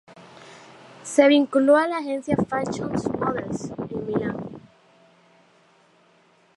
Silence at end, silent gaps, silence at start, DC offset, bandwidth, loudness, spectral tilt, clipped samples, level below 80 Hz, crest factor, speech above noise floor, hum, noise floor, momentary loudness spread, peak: 1.95 s; none; 0.1 s; under 0.1%; 11.5 kHz; -22 LUFS; -5.5 dB/octave; under 0.1%; -56 dBFS; 22 dB; 37 dB; none; -59 dBFS; 18 LU; -2 dBFS